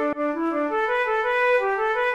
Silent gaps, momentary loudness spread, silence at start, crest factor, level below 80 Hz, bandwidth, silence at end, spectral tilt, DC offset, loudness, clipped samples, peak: none; 5 LU; 0 s; 10 dB; -56 dBFS; 9.4 kHz; 0 s; -4 dB/octave; 0.1%; -22 LUFS; under 0.1%; -12 dBFS